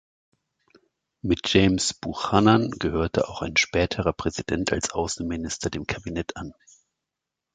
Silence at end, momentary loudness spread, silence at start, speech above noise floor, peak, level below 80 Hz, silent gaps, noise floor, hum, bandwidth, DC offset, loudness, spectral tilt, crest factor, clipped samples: 1.05 s; 12 LU; 1.25 s; 61 dB; -4 dBFS; -42 dBFS; none; -85 dBFS; none; 9.4 kHz; under 0.1%; -24 LUFS; -4.5 dB/octave; 22 dB; under 0.1%